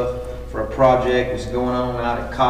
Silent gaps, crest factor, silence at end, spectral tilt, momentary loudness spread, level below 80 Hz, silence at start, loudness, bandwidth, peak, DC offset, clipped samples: none; 16 dB; 0 s; -6.5 dB/octave; 12 LU; -34 dBFS; 0 s; -20 LUFS; 15 kHz; -2 dBFS; 0.5%; under 0.1%